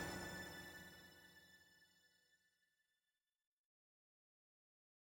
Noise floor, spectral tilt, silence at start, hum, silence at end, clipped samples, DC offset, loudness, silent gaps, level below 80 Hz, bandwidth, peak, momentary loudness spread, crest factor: under -90 dBFS; -3.5 dB/octave; 0 s; none; 2.8 s; under 0.1%; under 0.1%; -53 LUFS; none; -76 dBFS; 19.5 kHz; -36 dBFS; 17 LU; 22 dB